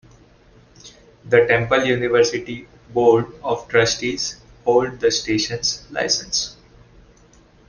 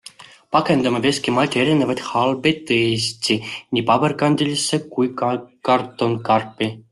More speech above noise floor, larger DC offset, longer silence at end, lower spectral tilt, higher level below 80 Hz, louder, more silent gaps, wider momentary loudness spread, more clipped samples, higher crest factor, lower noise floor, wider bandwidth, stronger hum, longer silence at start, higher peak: first, 32 dB vs 24 dB; neither; first, 1.15 s vs 0.1 s; about the same, -3.5 dB/octave vs -4.5 dB/octave; first, -50 dBFS vs -58 dBFS; about the same, -19 LUFS vs -19 LUFS; neither; first, 10 LU vs 6 LU; neither; about the same, 18 dB vs 16 dB; first, -51 dBFS vs -43 dBFS; second, 10 kHz vs 12.5 kHz; neither; first, 0.85 s vs 0.2 s; about the same, -2 dBFS vs -2 dBFS